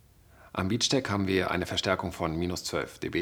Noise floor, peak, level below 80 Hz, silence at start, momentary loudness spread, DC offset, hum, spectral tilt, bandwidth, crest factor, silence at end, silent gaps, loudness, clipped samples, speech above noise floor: -56 dBFS; -8 dBFS; -56 dBFS; 0.4 s; 7 LU; under 0.1%; none; -4 dB/octave; over 20 kHz; 20 dB; 0 s; none; -29 LUFS; under 0.1%; 27 dB